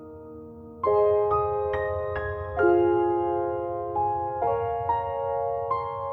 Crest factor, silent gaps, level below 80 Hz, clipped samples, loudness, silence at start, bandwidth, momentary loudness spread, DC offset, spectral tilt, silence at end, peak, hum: 16 dB; none; -48 dBFS; under 0.1%; -26 LUFS; 0 s; 4.5 kHz; 9 LU; under 0.1%; -10 dB/octave; 0 s; -10 dBFS; none